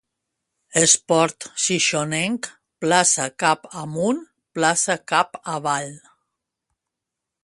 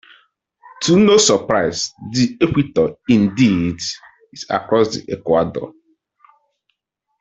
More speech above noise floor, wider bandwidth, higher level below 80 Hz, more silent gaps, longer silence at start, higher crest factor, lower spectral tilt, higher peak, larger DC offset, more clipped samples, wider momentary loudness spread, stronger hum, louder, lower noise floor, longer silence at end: first, 63 dB vs 58 dB; first, 11.5 kHz vs 8.4 kHz; second, -66 dBFS vs -50 dBFS; neither; about the same, 0.75 s vs 0.8 s; about the same, 22 dB vs 18 dB; second, -2.5 dB/octave vs -4.5 dB/octave; about the same, 0 dBFS vs 0 dBFS; neither; neither; about the same, 12 LU vs 13 LU; neither; second, -20 LUFS vs -17 LUFS; first, -84 dBFS vs -75 dBFS; about the same, 1.45 s vs 1.5 s